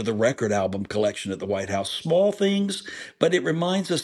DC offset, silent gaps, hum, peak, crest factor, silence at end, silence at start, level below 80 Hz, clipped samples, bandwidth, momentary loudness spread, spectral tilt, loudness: under 0.1%; none; none; -4 dBFS; 20 dB; 0 s; 0 s; -64 dBFS; under 0.1%; 13 kHz; 7 LU; -5 dB/octave; -24 LUFS